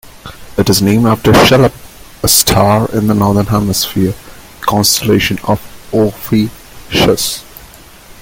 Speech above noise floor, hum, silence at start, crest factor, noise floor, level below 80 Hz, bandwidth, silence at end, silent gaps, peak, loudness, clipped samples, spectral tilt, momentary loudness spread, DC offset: 26 dB; none; 0.05 s; 12 dB; -36 dBFS; -34 dBFS; 17 kHz; 0.1 s; none; 0 dBFS; -11 LUFS; under 0.1%; -4.5 dB/octave; 10 LU; under 0.1%